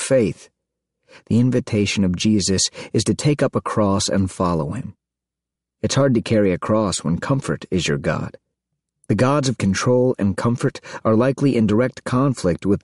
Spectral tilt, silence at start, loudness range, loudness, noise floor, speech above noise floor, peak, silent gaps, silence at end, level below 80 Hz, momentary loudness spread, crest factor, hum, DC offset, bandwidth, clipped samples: -5.5 dB/octave; 0 s; 3 LU; -19 LUFS; -85 dBFS; 66 dB; -6 dBFS; none; 0.05 s; -48 dBFS; 7 LU; 14 dB; none; 0.2%; 11.5 kHz; under 0.1%